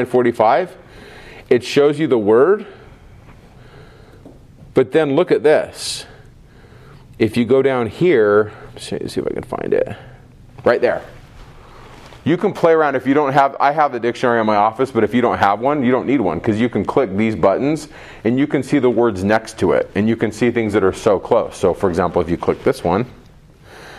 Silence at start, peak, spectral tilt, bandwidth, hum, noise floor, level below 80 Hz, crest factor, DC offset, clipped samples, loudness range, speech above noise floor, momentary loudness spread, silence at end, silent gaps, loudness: 0 s; 0 dBFS; -6.5 dB/octave; 13 kHz; none; -44 dBFS; -46 dBFS; 18 dB; under 0.1%; under 0.1%; 4 LU; 28 dB; 10 LU; 0 s; none; -17 LUFS